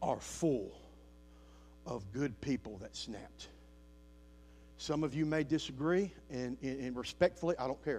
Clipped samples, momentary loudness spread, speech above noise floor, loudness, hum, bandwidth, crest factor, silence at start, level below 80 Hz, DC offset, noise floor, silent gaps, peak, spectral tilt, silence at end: under 0.1%; 15 LU; 21 dB; -37 LUFS; none; 14.5 kHz; 22 dB; 0 s; -60 dBFS; under 0.1%; -58 dBFS; none; -16 dBFS; -5.5 dB/octave; 0 s